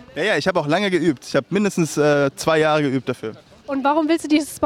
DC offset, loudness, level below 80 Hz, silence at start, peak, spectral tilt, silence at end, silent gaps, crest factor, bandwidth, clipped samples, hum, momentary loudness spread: under 0.1%; -19 LUFS; -58 dBFS; 0 s; -4 dBFS; -5 dB/octave; 0 s; none; 16 dB; 16 kHz; under 0.1%; none; 7 LU